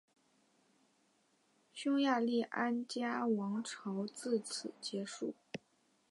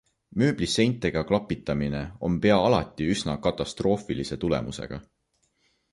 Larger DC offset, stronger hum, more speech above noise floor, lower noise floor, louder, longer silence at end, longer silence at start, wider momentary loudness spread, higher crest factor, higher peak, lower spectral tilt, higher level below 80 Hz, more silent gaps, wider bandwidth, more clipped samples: neither; neither; second, 38 dB vs 46 dB; first, -75 dBFS vs -71 dBFS; second, -38 LUFS vs -26 LUFS; second, 0.55 s vs 0.9 s; first, 1.75 s vs 0.35 s; about the same, 11 LU vs 10 LU; about the same, 18 dB vs 20 dB; second, -20 dBFS vs -8 dBFS; second, -4.5 dB/octave vs -6 dB/octave; second, -88 dBFS vs -46 dBFS; neither; about the same, 11.5 kHz vs 11.5 kHz; neither